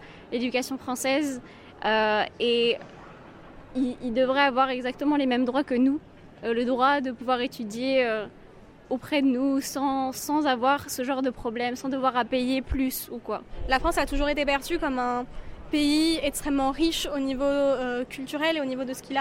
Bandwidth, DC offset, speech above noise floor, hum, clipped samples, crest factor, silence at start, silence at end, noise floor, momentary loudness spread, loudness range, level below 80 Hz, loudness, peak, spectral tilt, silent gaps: 16.5 kHz; under 0.1%; 24 dB; none; under 0.1%; 18 dB; 0 s; 0 s; -49 dBFS; 10 LU; 2 LU; -44 dBFS; -26 LUFS; -8 dBFS; -3.5 dB/octave; none